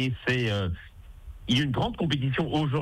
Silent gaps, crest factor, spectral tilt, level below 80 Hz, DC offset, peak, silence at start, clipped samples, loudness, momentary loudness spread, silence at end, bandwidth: none; 12 dB; -6 dB/octave; -46 dBFS; under 0.1%; -14 dBFS; 0 s; under 0.1%; -27 LUFS; 13 LU; 0 s; 12 kHz